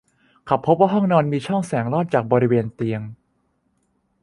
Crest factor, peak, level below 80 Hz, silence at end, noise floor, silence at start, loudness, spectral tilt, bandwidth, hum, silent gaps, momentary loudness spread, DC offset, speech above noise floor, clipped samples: 20 dB; -2 dBFS; -60 dBFS; 1.1 s; -67 dBFS; 0.45 s; -20 LUFS; -8 dB/octave; 11.5 kHz; none; none; 9 LU; under 0.1%; 48 dB; under 0.1%